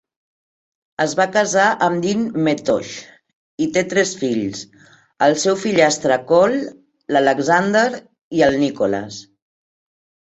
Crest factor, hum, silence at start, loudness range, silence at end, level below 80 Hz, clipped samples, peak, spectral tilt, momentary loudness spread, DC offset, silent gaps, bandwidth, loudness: 18 dB; none; 1 s; 4 LU; 1.05 s; -58 dBFS; under 0.1%; 0 dBFS; -4 dB/octave; 13 LU; under 0.1%; 3.33-3.58 s, 8.21-8.31 s; 8.2 kHz; -18 LUFS